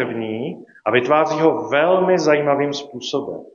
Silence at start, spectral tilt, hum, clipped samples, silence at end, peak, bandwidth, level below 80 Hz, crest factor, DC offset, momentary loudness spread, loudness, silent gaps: 0 s; -5.5 dB/octave; none; under 0.1%; 0.1 s; -2 dBFS; 7.4 kHz; -66 dBFS; 18 dB; under 0.1%; 11 LU; -18 LUFS; none